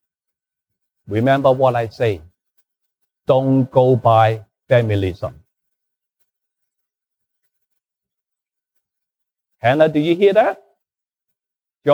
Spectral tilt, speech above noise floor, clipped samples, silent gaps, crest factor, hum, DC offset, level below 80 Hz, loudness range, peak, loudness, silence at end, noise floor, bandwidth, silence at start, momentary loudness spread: -8.5 dB/octave; 73 dB; under 0.1%; none; 18 dB; none; under 0.1%; -54 dBFS; 7 LU; -2 dBFS; -16 LUFS; 0 s; -88 dBFS; 12 kHz; 1.1 s; 15 LU